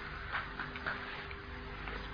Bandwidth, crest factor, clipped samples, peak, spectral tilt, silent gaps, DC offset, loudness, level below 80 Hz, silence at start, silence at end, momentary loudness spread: 5.2 kHz; 20 dB; under 0.1%; -22 dBFS; -2.5 dB/octave; none; under 0.1%; -41 LUFS; -50 dBFS; 0 s; 0 s; 6 LU